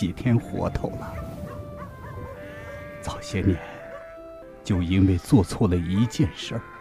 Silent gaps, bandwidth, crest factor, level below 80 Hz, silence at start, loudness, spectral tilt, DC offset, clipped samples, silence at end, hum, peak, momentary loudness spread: none; 15 kHz; 20 dB; -42 dBFS; 0 s; -25 LUFS; -7 dB/octave; under 0.1%; under 0.1%; 0 s; none; -6 dBFS; 18 LU